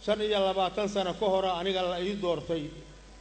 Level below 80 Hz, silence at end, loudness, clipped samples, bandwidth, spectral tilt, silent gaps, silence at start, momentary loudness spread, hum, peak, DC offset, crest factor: -52 dBFS; 0 s; -29 LUFS; under 0.1%; 9 kHz; -5 dB/octave; none; 0 s; 8 LU; none; -14 dBFS; under 0.1%; 14 dB